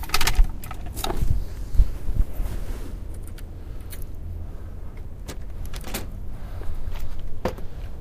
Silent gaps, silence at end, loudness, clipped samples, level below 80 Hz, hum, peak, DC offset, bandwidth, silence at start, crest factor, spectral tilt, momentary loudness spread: none; 0 s; -32 LUFS; under 0.1%; -26 dBFS; none; -2 dBFS; under 0.1%; 15.5 kHz; 0 s; 22 dB; -4 dB/octave; 13 LU